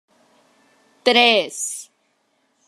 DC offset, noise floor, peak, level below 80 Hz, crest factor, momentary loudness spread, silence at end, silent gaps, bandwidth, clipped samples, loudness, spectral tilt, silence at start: under 0.1%; -66 dBFS; 0 dBFS; -80 dBFS; 22 dB; 14 LU; 0.85 s; none; 14 kHz; under 0.1%; -17 LUFS; -1 dB/octave; 1.05 s